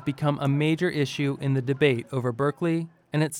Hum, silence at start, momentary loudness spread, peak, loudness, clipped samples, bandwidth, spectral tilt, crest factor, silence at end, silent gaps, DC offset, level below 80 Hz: none; 0 s; 5 LU; -8 dBFS; -26 LUFS; under 0.1%; 16 kHz; -6.5 dB/octave; 16 dB; 0 s; none; under 0.1%; -64 dBFS